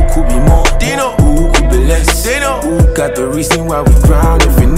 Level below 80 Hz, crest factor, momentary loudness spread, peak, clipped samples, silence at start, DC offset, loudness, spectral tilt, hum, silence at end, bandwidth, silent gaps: -10 dBFS; 8 dB; 4 LU; 0 dBFS; under 0.1%; 0 s; under 0.1%; -11 LUFS; -5 dB/octave; none; 0 s; 16 kHz; none